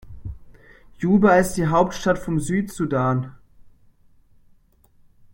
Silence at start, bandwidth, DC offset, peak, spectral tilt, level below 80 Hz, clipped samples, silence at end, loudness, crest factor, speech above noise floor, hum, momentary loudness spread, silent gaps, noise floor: 0.1 s; 16.5 kHz; under 0.1%; -4 dBFS; -6.5 dB/octave; -44 dBFS; under 0.1%; 1.65 s; -20 LUFS; 20 dB; 37 dB; none; 21 LU; none; -56 dBFS